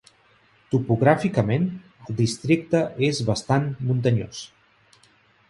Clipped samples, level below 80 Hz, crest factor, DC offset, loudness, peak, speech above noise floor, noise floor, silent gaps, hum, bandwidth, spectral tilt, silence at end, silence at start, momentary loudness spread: under 0.1%; -54 dBFS; 20 dB; under 0.1%; -23 LUFS; -4 dBFS; 37 dB; -59 dBFS; none; none; 11.5 kHz; -6.5 dB/octave; 1.05 s; 0.7 s; 14 LU